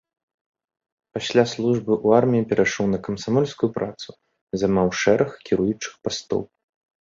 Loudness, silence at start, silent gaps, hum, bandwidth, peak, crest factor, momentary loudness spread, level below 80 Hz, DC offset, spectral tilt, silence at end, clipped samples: -22 LUFS; 1.15 s; 4.41-4.47 s; none; 7.6 kHz; -2 dBFS; 20 dB; 12 LU; -54 dBFS; under 0.1%; -5.5 dB/octave; 0.55 s; under 0.1%